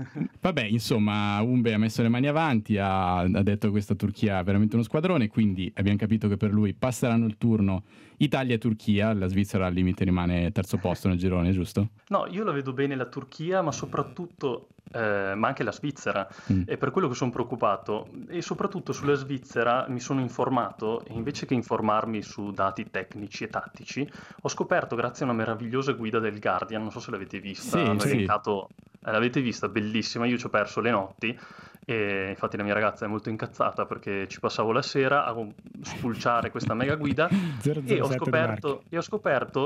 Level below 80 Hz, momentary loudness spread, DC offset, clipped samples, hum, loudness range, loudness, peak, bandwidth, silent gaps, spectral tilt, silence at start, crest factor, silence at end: -60 dBFS; 9 LU; under 0.1%; under 0.1%; none; 4 LU; -27 LUFS; -10 dBFS; 15.5 kHz; none; -6.5 dB/octave; 0 s; 16 dB; 0 s